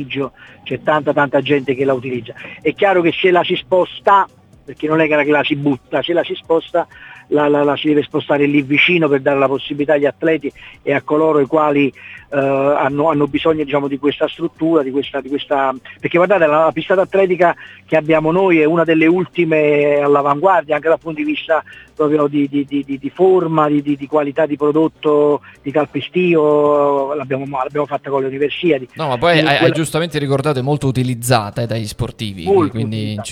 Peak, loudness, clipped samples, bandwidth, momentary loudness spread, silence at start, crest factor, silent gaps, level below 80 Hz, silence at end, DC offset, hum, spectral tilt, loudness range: 0 dBFS; -15 LUFS; under 0.1%; 15 kHz; 9 LU; 0 s; 16 dB; none; -50 dBFS; 0 s; under 0.1%; none; -6 dB/octave; 3 LU